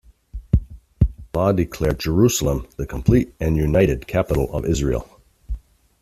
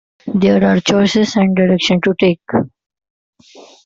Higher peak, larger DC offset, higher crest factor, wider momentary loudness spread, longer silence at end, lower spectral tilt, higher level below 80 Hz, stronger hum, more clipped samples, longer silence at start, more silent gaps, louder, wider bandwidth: about the same, -2 dBFS vs -2 dBFS; neither; first, 18 dB vs 12 dB; first, 17 LU vs 7 LU; first, 0.45 s vs 0.25 s; about the same, -6.5 dB/octave vs -6 dB/octave; first, -30 dBFS vs -50 dBFS; neither; neither; about the same, 0.35 s vs 0.25 s; second, none vs 3.10-3.33 s; second, -21 LUFS vs -14 LUFS; first, 15.5 kHz vs 7.6 kHz